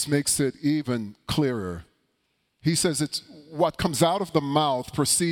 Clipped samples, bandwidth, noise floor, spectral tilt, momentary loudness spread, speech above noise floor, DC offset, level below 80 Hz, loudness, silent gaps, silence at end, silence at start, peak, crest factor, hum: under 0.1%; 18.5 kHz; -73 dBFS; -4 dB/octave; 9 LU; 48 dB; under 0.1%; -52 dBFS; -25 LUFS; none; 0 s; 0 s; -8 dBFS; 18 dB; none